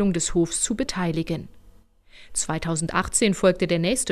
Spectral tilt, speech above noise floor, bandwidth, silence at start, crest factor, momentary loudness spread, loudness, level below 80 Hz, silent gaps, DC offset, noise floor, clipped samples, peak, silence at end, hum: -4 dB/octave; 29 dB; 15.5 kHz; 0 s; 18 dB; 8 LU; -23 LUFS; -42 dBFS; none; under 0.1%; -52 dBFS; under 0.1%; -6 dBFS; 0 s; none